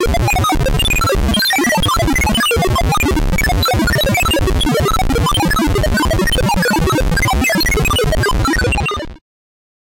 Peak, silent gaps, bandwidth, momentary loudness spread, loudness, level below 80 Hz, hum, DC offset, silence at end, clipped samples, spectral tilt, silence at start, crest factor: -8 dBFS; none; 17 kHz; 2 LU; -14 LUFS; -20 dBFS; none; under 0.1%; 0.8 s; under 0.1%; -4 dB/octave; 0 s; 6 dB